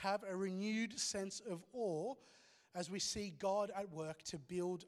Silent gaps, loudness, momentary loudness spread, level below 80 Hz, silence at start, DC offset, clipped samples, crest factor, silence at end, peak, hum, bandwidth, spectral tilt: none; -43 LUFS; 8 LU; -74 dBFS; 0 s; under 0.1%; under 0.1%; 18 dB; 0 s; -24 dBFS; none; 14 kHz; -3.5 dB/octave